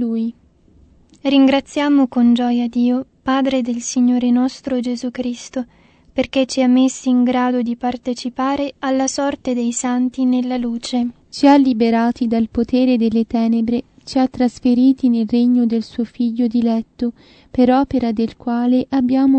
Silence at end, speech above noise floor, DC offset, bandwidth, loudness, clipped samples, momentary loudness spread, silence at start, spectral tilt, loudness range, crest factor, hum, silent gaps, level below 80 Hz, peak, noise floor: 0 s; 34 dB; under 0.1%; 8.8 kHz; -17 LUFS; under 0.1%; 10 LU; 0 s; -4.5 dB/octave; 3 LU; 16 dB; none; none; -50 dBFS; 0 dBFS; -50 dBFS